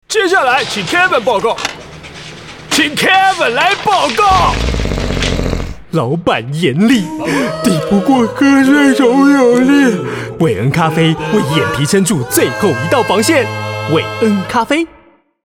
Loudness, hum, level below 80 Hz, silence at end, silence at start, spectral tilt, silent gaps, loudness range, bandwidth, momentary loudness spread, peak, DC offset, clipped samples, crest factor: -12 LUFS; none; -30 dBFS; 0.6 s; 0.1 s; -4.5 dB/octave; none; 3 LU; 18.5 kHz; 10 LU; 0 dBFS; under 0.1%; under 0.1%; 12 dB